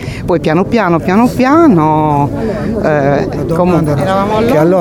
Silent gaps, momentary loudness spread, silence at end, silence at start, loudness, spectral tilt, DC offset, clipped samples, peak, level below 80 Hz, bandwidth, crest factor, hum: none; 7 LU; 0 s; 0 s; -11 LUFS; -7.5 dB/octave; under 0.1%; under 0.1%; 0 dBFS; -32 dBFS; 17.5 kHz; 10 dB; none